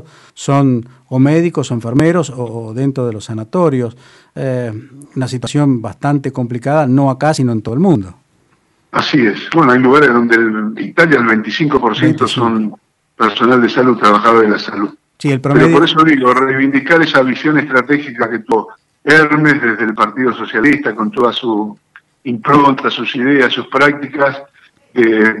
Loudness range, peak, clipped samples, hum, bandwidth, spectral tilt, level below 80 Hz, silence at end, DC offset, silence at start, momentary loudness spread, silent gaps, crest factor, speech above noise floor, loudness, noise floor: 6 LU; 0 dBFS; under 0.1%; none; 11.5 kHz; -6.5 dB/octave; -52 dBFS; 0 s; under 0.1%; 0.35 s; 12 LU; none; 12 dB; 44 dB; -12 LUFS; -56 dBFS